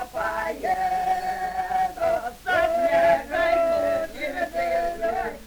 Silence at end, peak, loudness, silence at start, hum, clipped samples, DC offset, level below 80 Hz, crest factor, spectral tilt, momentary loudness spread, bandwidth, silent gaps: 0 s; -10 dBFS; -24 LUFS; 0 s; none; under 0.1%; under 0.1%; -48 dBFS; 14 dB; -4 dB/octave; 7 LU; over 20 kHz; none